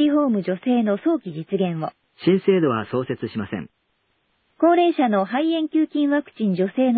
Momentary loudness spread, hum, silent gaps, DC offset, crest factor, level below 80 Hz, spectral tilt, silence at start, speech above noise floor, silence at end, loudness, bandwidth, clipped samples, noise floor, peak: 10 LU; none; none; under 0.1%; 16 dB; -62 dBFS; -11.5 dB/octave; 0 s; 49 dB; 0 s; -21 LUFS; 4.7 kHz; under 0.1%; -69 dBFS; -6 dBFS